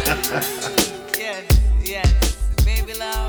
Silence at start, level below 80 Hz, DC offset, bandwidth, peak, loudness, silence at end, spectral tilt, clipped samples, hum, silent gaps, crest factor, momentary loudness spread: 0 s; -20 dBFS; under 0.1%; over 20 kHz; 0 dBFS; -20 LUFS; 0 s; -4 dB/octave; under 0.1%; none; none; 18 dB; 6 LU